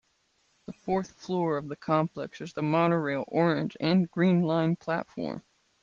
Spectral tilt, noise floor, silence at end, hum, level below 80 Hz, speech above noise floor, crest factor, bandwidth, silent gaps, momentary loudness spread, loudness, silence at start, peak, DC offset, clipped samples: -8 dB/octave; -71 dBFS; 0.4 s; none; -68 dBFS; 43 dB; 16 dB; 7.2 kHz; none; 12 LU; -28 LUFS; 0.7 s; -12 dBFS; under 0.1%; under 0.1%